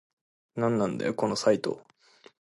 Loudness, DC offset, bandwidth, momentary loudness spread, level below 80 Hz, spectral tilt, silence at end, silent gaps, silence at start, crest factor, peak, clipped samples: -28 LUFS; under 0.1%; 11.5 kHz; 13 LU; -68 dBFS; -5.5 dB/octave; 0.6 s; none; 0.55 s; 20 dB; -10 dBFS; under 0.1%